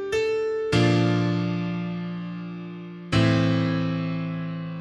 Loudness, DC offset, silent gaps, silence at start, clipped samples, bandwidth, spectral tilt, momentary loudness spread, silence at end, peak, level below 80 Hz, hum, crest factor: -25 LUFS; under 0.1%; none; 0 s; under 0.1%; 10.5 kHz; -7 dB/octave; 14 LU; 0 s; -8 dBFS; -50 dBFS; none; 16 dB